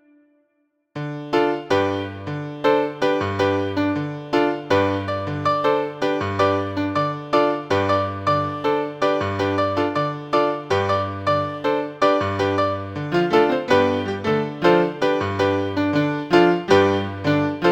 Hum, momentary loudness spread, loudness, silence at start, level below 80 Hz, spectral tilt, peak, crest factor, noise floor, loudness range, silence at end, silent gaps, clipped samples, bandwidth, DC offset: none; 6 LU; -21 LUFS; 0.95 s; -58 dBFS; -6.5 dB/octave; -2 dBFS; 20 dB; -69 dBFS; 3 LU; 0 s; none; under 0.1%; 16.5 kHz; under 0.1%